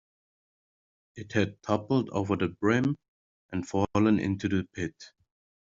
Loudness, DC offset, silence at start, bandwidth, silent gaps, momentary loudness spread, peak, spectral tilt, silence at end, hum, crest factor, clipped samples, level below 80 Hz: -29 LUFS; under 0.1%; 1.15 s; 7.8 kHz; 3.08-3.49 s; 12 LU; -10 dBFS; -6.5 dB/octave; 0.7 s; none; 20 dB; under 0.1%; -62 dBFS